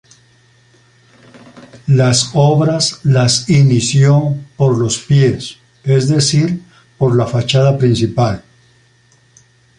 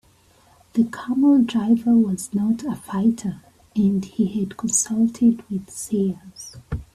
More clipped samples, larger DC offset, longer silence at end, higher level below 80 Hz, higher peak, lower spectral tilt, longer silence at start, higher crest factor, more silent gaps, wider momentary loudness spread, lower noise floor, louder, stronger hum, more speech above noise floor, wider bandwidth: neither; neither; first, 1.4 s vs 0.1 s; about the same, -46 dBFS vs -48 dBFS; first, -2 dBFS vs -6 dBFS; about the same, -5.5 dB/octave vs -5.5 dB/octave; first, 1.55 s vs 0.75 s; about the same, 14 dB vs 16 dB; neither; second, 9 LU vs 14 LU; second, -51 dBFS vs -56 dBFS; first, -13 LUFS vs -21 LUFS; neither; first, 40 dB vs 35 dB; second, 11 kHz vs 13.5 kHz